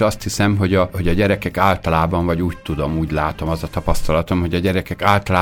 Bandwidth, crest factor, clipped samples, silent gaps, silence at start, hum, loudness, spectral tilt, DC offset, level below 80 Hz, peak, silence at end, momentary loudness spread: 19 kHz; 16 dB; under 0.1%; none; 0 s; none; -19 LUFS; -6 dB/octave; under 0.1%; -30 dBFS; 0 dBFS; 0 s; 6 LU